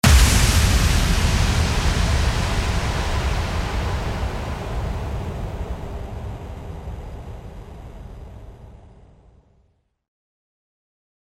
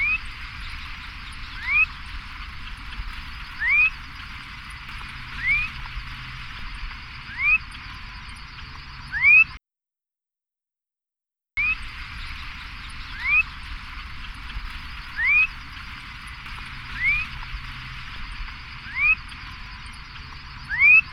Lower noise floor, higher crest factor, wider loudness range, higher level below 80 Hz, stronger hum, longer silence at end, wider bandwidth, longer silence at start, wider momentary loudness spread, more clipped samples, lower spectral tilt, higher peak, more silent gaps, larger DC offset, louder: second, -63 dBFS vs -87 dBFS; about the same, 20 dB vs 20 dB; first, 22 LU vs 9 LU; first, -24 dBFS vs -40 dBFS; neither; first, 2.4 s vs 0 s; first, 16 kHz vs 13.5 kHz; about the same, 0.05 s vs 0 s; about the same, 22 LU vs 20 LU; neither; about the same, -4 dB/octave vs -3 dB/octave; first, -2 dBFS vs -6 dBFS; neither; neither; about the same, -22 LUFS vs -20 LUFS